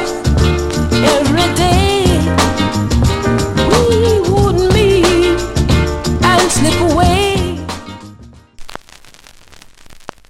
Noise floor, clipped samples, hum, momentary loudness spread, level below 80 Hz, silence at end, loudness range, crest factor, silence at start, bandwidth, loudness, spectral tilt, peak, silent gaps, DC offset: -40 dBFS; under 0.1%; none; 9 LU; -24 dBFS; 0.25 s; 5 LU; 14 dB; 0 s; 16 kHz; -12 LUFS; -5 dB/octave; 0 dBFS; none; under 0.1%